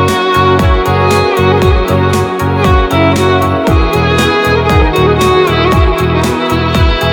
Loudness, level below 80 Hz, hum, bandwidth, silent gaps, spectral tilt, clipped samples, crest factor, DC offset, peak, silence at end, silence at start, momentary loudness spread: -10 LUFS; -18 dBFS; none; 18.5 kHz; none; -6 dB/octave; under 0.1%; 10 dB; under 0.1%; 0 dBFS; 0 s; 0 s; 3 LU